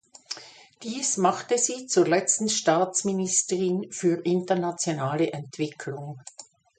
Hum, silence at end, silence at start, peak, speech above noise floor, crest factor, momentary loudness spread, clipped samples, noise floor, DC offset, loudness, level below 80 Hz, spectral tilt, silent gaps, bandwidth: none; 0.35 s; 0.3 s; -8 dBFS; 22 dB; 18 dB; 15 LU; under 0.1%; -47 dBFS; under 0.1%; -25 LUFS; -72 dBFS; -3.5 dB/octave; none; 9.6 kHz